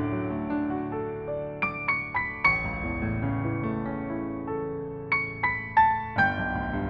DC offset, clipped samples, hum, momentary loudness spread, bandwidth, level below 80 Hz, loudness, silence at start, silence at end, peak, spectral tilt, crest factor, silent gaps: under 0.1%; under 0.1%; none; 9 LU; 7 kHz; -44 dBFS; -28 LUFS; 0 s; 0 s; -10 dBFS; -8.5 dB/octave; 18 dB; none